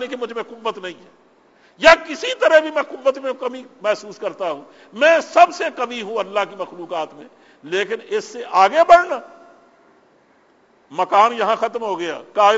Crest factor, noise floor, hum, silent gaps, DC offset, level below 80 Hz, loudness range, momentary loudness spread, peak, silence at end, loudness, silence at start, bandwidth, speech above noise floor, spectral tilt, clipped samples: 18 dB; -56 dBFS; none; none; under 0.1%; -58 dBFS; 3 LU; 16 LU; 0 dBFS; 0 s; -18 LUFS; 0 s; 8 kHz; 37 dB; -2.5 dB/octave; under 0.1%